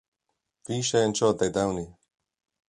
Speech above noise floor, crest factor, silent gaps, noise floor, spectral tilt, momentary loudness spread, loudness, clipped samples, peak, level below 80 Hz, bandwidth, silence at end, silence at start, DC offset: 56 dB; 20 dB; none; -81 dBFS; -4.5 dB/octave; 11 LU; -26 LUFS; under 0.1%; -8 dBFS; -56 dBFS; 11.5 kHz; 0.8 s; 0.7 s; under 0.1%